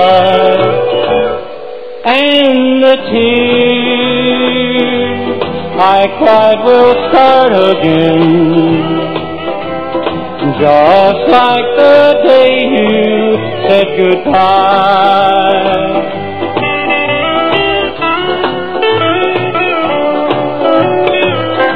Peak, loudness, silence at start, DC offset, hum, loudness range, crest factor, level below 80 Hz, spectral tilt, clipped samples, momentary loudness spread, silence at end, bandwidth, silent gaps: 0 dBFS; -9 LUFS; 0 s; 3%; none; 4 LU; 10 dB; -44 dBFS; -8 dB/octave; 0.9%; 9 LU; 0 s; 5.4 kHz; none